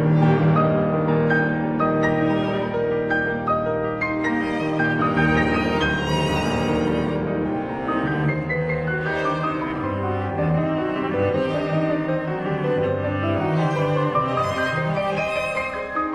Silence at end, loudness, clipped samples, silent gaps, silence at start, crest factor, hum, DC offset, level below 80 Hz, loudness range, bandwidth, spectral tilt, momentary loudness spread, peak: 0 s; -22 LUFS; under 0.1%; none; 0 s; 16 dB; none; under 0.1%; -44 dBFS; 2 LU; 11 kHz; -7.5 dB/octave; 6 LU; -6 dBFS